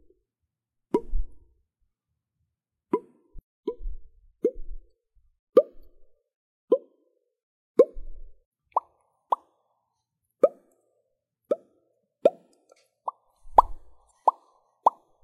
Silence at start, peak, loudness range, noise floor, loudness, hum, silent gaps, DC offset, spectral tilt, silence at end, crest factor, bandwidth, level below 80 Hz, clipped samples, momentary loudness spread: 0.95 s; -2 dBFS; 9 LU; -84 dBFS; -27 LUFS; none; 3.43-3.63 s, 5.39-5.53 s, 6.35-6.68 s, 7.43-7.75 s, 8.45-8.52 s; under 0.1%; -8 dB/octave; 0.35 s; 28 dB; 10.5 kHz; -42 dBFS; under 0.1%; 17 LU